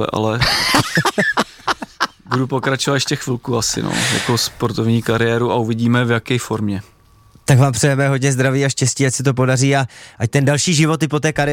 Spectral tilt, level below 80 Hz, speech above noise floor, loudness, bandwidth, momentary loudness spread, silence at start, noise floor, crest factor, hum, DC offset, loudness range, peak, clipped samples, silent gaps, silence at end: -4.5 dB/octave; -44 dBFS; 32 dB; -17 LUFS; 16.5 kHz; 7 LU; 0 s; -49 dBFS; 16 dB; none; under 0.1%; 2 LU; -2 dBFS; under 0.1%; none; 0 s